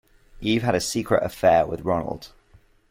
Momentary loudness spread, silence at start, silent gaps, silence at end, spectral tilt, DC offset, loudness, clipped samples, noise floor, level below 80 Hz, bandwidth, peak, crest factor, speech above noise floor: 12 LU; 0.35 s; none; 0.65 s; -5 dB/octave; under 0.1%; -23 LUFS; under 0.1%; -56 dBFS; -48 dBFS; 16.5 kHz; -6 dBFS; 18 dB; 34 dB